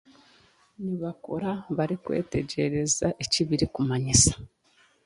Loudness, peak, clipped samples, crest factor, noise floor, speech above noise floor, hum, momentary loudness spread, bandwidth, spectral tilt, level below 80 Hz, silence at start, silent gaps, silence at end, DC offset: -26 LUFS; -4 dBFS; under 0.1%; 24 dB; -63 dBFS; 37 dB; none; 14 LU; 11.5 kHz; -4 dB/octave; -46 dBFS; 0.8 s; none; 0.6 s; under 0.1%